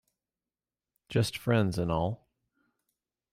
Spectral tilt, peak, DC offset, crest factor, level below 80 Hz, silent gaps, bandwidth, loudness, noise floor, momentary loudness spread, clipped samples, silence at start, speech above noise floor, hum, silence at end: -6.5 dB/octave; -14 dBFS; under 0.1%; 20 dB; -56 dBFS; none; 15.5 kHz; -30 LUFS; under -90 dBFS; 7 LU; under 0.1%; 1.1 s; over 62 dB; none; 1.2 s